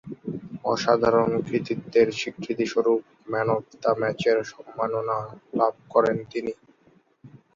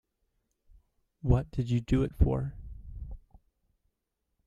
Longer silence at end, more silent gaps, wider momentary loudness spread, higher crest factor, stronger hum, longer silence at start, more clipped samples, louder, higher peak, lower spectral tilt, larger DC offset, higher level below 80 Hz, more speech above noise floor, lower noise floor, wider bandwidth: second, 0.25 s vs 1.3 s; neither; second, 11 LU vs 19 LU; about the same, 20 dB vs 22 dB; neither; second, 0.05 s vs 1.25 s; neither; first, -25 LUFS vs -30 LUFS; first, -6 dBFS vs -10 dBFS; second, -6 dB/octave vs -9 dB/octave; neither; second, -62 dBFS vs -38 dBFS; second, 36 dB vs 55 dB; second, -60 dBFS vs -82 dBFS; about the same, 7.4 kHz vs 7.6 kHz